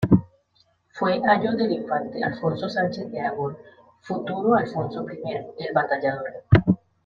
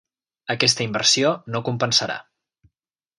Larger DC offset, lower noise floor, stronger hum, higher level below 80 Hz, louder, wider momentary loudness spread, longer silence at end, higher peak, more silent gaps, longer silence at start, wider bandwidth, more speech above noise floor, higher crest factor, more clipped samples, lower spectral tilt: neither; second, -64 dBFS vs -84 dBFS; neither; first, -48 dBFS vs -64 dBFS; second, -24 LUFS vs -20 LUFS; about the same, 12 LU vs 13 LU; second, 0.3 s vs 1 s; about the same, -2 dBFS vs -2 dBFS; neither; second, 0 s vs 0.5 s; second, 7.2 kHz vs 11.5 kHz; second, 41 dB vs 63 dB; about the same, 22 dB vs 22 dB; neither; first, -8.5 dB/octave vs -2.5 dB/octave